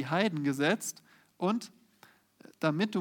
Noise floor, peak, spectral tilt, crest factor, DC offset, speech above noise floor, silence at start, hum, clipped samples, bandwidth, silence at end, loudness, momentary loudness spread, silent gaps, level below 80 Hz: -62 dBFS; -12 dBFS; -5 dB/octave; 20 dB; under 0.1%; 32 dB; 0 s; none; under 0.1%; 18.5 kHz; 0 s; -31 LUFS; 11 LU; none; -84 dBFS